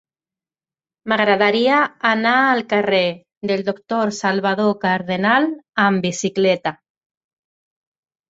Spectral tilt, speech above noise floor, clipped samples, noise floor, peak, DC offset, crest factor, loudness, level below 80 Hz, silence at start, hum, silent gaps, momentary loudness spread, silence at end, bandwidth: -4.5 dB/octave; over 72 dB; under 0.1%; under -90 dBFS; -2 dBFS; under 0.1%; 18 dB; -18 LUFS; -64 dBFS; 1.05 s; none; 3.37-3.41 s; 7 LU; 1.55 s; 8 kHz